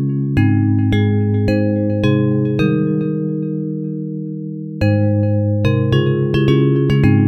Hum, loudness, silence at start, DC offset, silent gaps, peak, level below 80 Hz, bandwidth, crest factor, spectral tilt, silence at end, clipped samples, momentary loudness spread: none; -16 LUFS; 0 s; under 0.1%; none; -2 dBFS; -38 dBFS; 6.4 kHz; 12 dB; -9.5 dB/octave; 0 s; under 0.1%; 9 LU